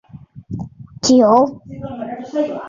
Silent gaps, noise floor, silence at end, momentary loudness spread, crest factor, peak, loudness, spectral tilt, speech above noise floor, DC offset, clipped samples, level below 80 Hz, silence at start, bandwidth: none; -36 dBFS; 0 s; 21 LU; 16 dB; -2 dBFS; -15 LUFS; -5 dB/octave; 20 dB; under 0.1%; under 0.1%; -50 dBFS; 0.15 s; 7.8 kHz